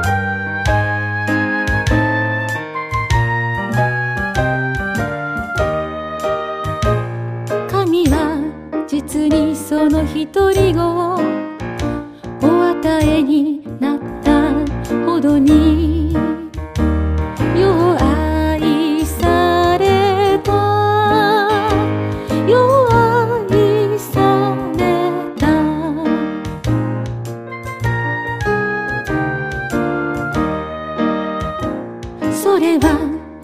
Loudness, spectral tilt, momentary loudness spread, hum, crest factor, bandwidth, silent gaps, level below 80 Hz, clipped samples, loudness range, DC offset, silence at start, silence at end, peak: -16 LUFS; -6.5 dB/octave; 9 LU; none; 14 dB; 15.5 kHz; none; -30 dBFS; under 0.1%; 6 LU; under 0.1%; 0 s; 0 s; 0 dBFS